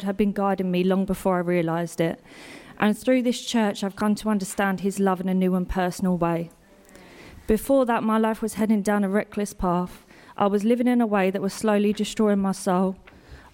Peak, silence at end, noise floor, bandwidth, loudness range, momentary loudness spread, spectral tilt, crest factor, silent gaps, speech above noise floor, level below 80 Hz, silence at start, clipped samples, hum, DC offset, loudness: -8 dBFS; 0.15 s; -50 dBFS; 17 kHz; 2 LU; 7 LU; -6 dB/octave; 16 dB; none; 27 dB; -46 dBFS; 0 s; under 0.1%; none; under 0.1%; -24 LUFS